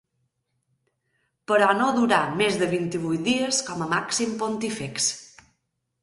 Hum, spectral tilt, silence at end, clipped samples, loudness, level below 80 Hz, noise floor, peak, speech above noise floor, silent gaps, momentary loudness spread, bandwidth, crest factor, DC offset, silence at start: none; -3.5 dB/octave; 0.75 s; under 0.1%; -23 LUFS; -64 dBFS; -76 dBFS; -6 dBFS; 53 dB; none; 7 LU; 11.5 kHz; 18 dB; under 0.1%; 1.5 s